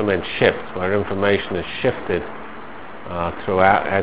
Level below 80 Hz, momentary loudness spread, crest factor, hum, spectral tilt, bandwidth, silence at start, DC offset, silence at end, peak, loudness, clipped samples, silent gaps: -42 dBFS; 19 LU; 20 dB; none; -9.5 dB/octave; 4 kHz; 0 s; 2%; 0 s; 0 dBFS; -20 LUFS; under 0.1%; none